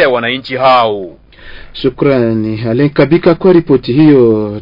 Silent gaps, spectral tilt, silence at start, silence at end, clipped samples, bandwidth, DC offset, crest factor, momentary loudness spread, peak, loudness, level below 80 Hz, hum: none; -9.5 dB/octave; 0 s; 0 s; under 0.1%; 5.4 kHz; under 0.1%; 10 dB; 10 LU; 0 dBFS; -10 LUFS; -40 dBFS; none